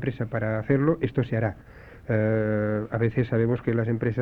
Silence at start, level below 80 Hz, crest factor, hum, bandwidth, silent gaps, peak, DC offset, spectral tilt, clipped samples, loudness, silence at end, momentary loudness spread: 0 s; -50 dBFS; 16 dB; none; 4.4 kHz; none; -8 dBFS; under 0.1%; -10.5 dB/octave; under 0.1%; -25 LUFS; 0 s; 6 LU